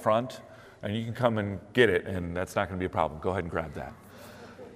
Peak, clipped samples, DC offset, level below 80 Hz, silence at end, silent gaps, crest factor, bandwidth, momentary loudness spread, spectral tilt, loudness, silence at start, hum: -8 dBFS; under 0.1%; under 0.1%; -56 dBFS; 0 s; none; 22 dB; 15.5 kHz; 22 LU; -6 dB/octave; -29 LUFS; 0 s; none